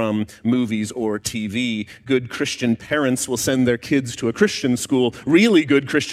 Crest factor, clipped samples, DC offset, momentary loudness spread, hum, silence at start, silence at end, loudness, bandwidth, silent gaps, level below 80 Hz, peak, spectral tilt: 18 dB; under 0.1%; under 0.1%; 8 LU; none; 0 s; 0 s; -20 LUFS; 15.5 kHz; none; -54 dBFS; -2 dBFS; -4.5 dB/octave